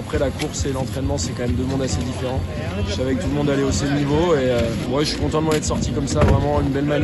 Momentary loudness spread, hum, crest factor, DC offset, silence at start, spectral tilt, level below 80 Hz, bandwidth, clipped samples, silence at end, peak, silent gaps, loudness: 6 LU; none; 16 dB; under 0.1%; 0 s; -5.5 dB/octave; -32 dBFS; 12.5 kHz; under 0.1%; 0 s; -4 dBFS; none; -21 LUFS